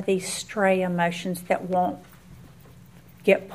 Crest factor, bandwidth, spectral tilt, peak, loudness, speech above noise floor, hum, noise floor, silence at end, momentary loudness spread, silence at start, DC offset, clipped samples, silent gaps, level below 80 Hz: 22 dB; 15.5 kHz; -5 dB/octave; -4 dBFS; -25 LUFS; 25 dB; none; -49 dBFS; 0 s; 7 LU; 0 s; 0.1%; under 0.1%; none; -60 dBFS